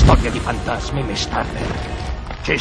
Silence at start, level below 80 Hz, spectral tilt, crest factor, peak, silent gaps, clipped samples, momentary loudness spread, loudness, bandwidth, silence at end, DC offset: 0 s; -22 dBFS; -5.5 dB/octave; 18 dB; 0 dBFS; none; under 0.1%; 9 LU; -22 LUFS; 10.5 kHz; 0 s; under 0.1%